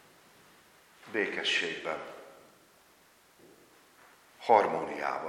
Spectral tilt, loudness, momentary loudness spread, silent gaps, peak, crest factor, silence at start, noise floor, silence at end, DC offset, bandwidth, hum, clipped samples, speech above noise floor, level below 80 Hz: -3 dB/octave; -30 LUFS; 15 LU; none; -10 dBFS; 26 dB; 1.05 s; -62 dBFS; 0 s; under 0.1%; 17 kHz; none; under 0.1%; 33 dB; -78 dBFS